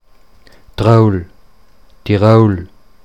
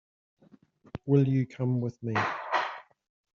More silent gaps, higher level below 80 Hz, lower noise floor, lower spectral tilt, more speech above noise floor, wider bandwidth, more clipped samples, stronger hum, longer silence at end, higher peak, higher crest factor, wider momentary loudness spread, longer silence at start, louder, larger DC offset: neither; first, -40 dBFS vs -66 dBFS; second, -49 dBFS vs -60 dBFS; first, -9 dB/octave vs -6.5 dB/octave; first, 39 dB vs 33 dB; first, 8.2 kHz vs 7 kHz; first, 0.1% vs under 0.1%; neither; second, 0.4 s vs 0.55 s; first, 0 dBFS vs -10 dBFS; second, 14 dB vs 20 dB; about the same, 17 LU vs 16 LU; second, 0.8 s vs 0.95 s; first, -12 LUFS vs -29 LUFS; first, 0.7% vs under 0.1%